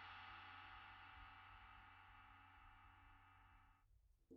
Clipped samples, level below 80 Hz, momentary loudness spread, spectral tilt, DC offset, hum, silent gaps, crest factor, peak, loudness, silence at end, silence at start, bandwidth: under 0.1%; -74 dBFS; 11 LU; -1.5 dB/octave; under 0.1%; none; none; 18 dB; -46 dBFS; -62 LUFS; 0 s; 0 s; 5.8 kHz